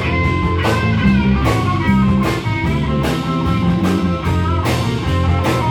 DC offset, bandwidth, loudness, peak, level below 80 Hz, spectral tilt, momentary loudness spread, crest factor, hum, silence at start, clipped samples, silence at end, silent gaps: under 0.1%; 18.5 kHz; -16 LUFS; -2 dBFS; -28 dBFS; -7 dB/octave; 4 LU; 14 dB; none; 0 s; under 0.1%; 0 s; none